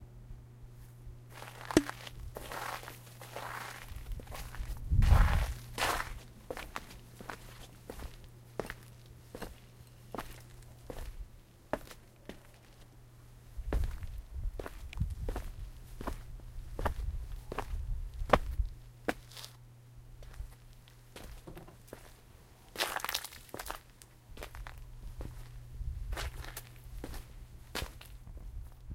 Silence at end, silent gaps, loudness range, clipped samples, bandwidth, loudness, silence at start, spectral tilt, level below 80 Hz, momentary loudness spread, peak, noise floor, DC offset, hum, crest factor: 0 s; none; 14 LU; under 0.1%; 16.5 kHz; -39 LUFS; 0 s; -5 dB/octave; -40 dBFS; 21 LU; -6 dBFS; -57 dBFS; under 0.1%; none; 34 dB